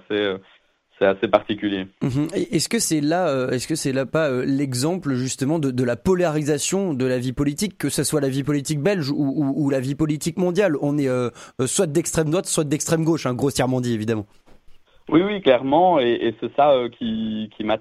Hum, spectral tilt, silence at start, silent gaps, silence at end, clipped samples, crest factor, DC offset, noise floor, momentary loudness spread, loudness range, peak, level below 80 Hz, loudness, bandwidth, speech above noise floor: none; -5 dB/octave; 0.1 s; none; 0 s; under 0.1%; 20 dB; under 0.1%; -47 dBFS; 7 LU; 2 LU; 0 dBFS; -50 dBFS; -21 LUFS; 15 kHz; 26 dB